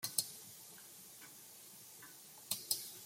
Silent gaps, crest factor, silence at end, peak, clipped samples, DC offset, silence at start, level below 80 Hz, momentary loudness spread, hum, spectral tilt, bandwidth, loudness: none; 30 dB; 0 s; -16 dBFS; under 0.1%; under 0.1%; 0 s; under -90 dBFS; 15 LU; none; 0.5 dB/octave; 16.5 kHz; -45 LUFS